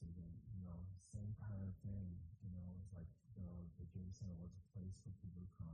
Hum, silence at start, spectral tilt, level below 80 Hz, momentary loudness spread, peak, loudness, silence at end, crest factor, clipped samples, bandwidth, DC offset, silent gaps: none; 0 s; -8.5 dB/octave; -64 dBFS; 6 LU; -40 dBFS; -54 LUFS; 0 s; 12 dB; under 0.1%; 9.4 kHz; under 0.1%; none